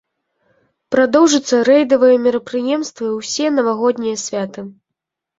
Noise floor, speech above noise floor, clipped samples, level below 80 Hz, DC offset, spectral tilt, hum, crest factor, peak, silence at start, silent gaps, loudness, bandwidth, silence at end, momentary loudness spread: -81 dBFS; 66 dB; under 0.1%; -62 dBFS; under 0.1%; -3.5 dB/octave; none; 14 dB; -2 dBFS; 0.9 s; none; -15 LUFS; 7.8 kHz; 0.7 s; 11 LU